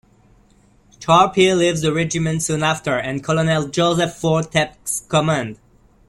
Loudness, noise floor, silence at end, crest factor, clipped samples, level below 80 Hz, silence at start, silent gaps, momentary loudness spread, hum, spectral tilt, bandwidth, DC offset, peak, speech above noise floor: -18 LUFS; -53 dBFS; 0.55 s; 18 dB; under 0.1%; -50 dBFS; 1 s; none; 8 LU; none; -4.5 dB/octave; 13.5 kHz; under 0.1%; -2 dBFS; 35 dB